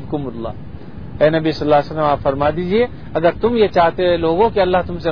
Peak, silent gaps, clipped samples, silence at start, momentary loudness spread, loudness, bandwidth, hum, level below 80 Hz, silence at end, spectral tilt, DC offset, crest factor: 0 dBFS; none; under 0.1%; 0 s; 14 LU; -16 LUFS; 5.4 kHz; none; -38 dBFS; 0 s; -8 dB/octave; 2%; 16 dB